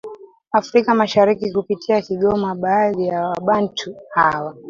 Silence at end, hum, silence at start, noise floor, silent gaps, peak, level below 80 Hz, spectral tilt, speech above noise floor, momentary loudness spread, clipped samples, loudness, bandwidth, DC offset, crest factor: 0 s; none; 0.05 s; -37 dBFS; none; -2 dBFS; -54 dBFS; -6 dB/octave; 19 dB; 7 LU; under 0.1%; -18 LUFS; 7.4 kHz; under 0.1%; 16 dB